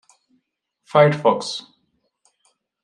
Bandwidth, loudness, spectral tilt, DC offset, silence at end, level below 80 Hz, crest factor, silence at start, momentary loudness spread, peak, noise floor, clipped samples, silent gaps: 10.5 kHz; -18 LUFS; -5.5 dB/octave; under 0.1%; 1.25 s; -70 dBFS; 22 dB; 0.95 s; 14 LU; -2 dBFS; -72 dBFS; under 0.1%; none